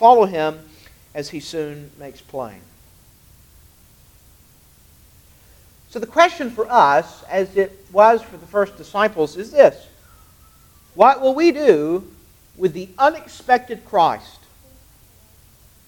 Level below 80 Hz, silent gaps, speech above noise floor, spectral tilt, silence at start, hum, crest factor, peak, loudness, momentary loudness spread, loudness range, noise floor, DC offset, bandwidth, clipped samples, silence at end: -54 dBFS; none; 33 dB; -5 dB/octave; 0 s; none; 20 dB; 0 dBFS; -17 LUFS; 18 LU; 16 LU; -51 dBFS; under 0.1%; 19 kHz; under 0.1%; 1.7 s